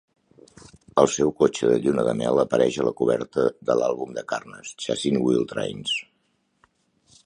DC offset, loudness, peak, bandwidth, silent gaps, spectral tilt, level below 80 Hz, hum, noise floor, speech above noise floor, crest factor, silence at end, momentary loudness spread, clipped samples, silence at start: under 0.1%; -23 LUFS; -2 dBFS; 11 kHz; none; -5 dB/octave; -58 dBFS; none; -70 dBFS; 47 dB; 22 dB; 1.25 s; 10 LU; under 0.1%; 0.95 s